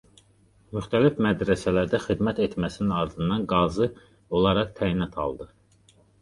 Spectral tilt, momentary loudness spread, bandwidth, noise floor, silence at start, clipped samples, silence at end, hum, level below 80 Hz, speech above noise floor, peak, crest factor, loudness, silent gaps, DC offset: -7 dB/octave; 9 LU; 11.5 kHz; -60 dBFS; 0.7 s; under 0.1%; 0.75 s; none; -46 dBFS; 35 dB; -6 dBFS; 20 dB; -25 LUFS; none; under 0.1%